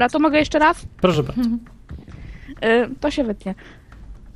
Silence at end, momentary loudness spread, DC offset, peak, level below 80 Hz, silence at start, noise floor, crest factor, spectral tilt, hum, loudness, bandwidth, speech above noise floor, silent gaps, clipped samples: 0.05 s; 22 LU; under 0.1%; -2 dBFS; -40 dBFS; 0 s; -40 dBFS; 20 dB; -6 dB/octave; none; -19 LUFS; 13.5 kHz; 21 dB; none; under 0.1%